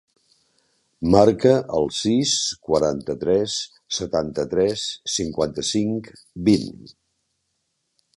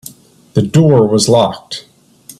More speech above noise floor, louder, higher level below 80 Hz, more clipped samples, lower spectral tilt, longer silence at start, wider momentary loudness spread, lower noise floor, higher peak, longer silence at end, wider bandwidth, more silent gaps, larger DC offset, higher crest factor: first, 53 dB vs 30 dB; second, -21 LUFS vs -11 LUFS; about the same, -48 dBFS vs -50 dBFS; neither; second, -4.5 dB/octave vs -6 dB/octave; first, 1 s vs 0.55 s; second, 12 LU vs 17 LU; first, -74 dBFS vs -41 dBFS; about the same, 0 dBFS vs 0 dBFS; first, 1.45 s vs 0.6 s; second, 11.5 kHz vs 14.5 kHz; neither; neither; first, 22 dB vs 14 dB